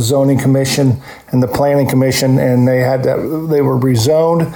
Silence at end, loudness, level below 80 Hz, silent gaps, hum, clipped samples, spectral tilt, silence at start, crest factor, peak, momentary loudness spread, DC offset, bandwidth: 0 s; -13 LUFS; -44 dBFS; none; none; under 0.1%; -6 dB/octave; 0 s; 8 dB; -4 dBFS; 4 LU; under 0.1%; 18 kHz